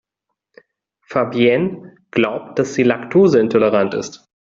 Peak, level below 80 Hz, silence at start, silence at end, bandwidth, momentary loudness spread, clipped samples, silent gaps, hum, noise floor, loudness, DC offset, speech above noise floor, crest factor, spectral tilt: -2 dBFS; -58 dBFS; 1.1 s; 0.25 s; 7.6 kHz; 11 LU; under 0.1%; none; none; -79 dBFS; -17 LUFS; under 0.1%; 63 dB; 16 dB; -6 dB/octave